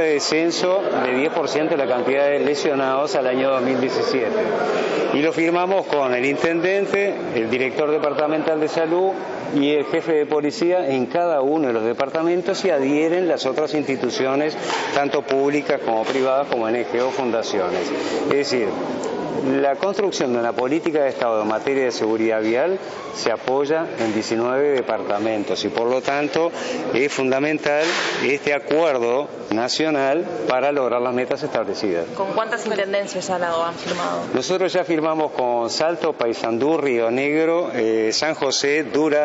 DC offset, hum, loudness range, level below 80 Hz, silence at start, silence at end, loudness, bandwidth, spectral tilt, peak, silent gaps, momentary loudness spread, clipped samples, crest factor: under 0.1%; none; 2 LU; -66 dBFS; 0 s; 0 s; -20 LUFS; 8 kHz; -3 dB/octave; 0 dBFS; none; 4 LU; under 0.1%; 20 dB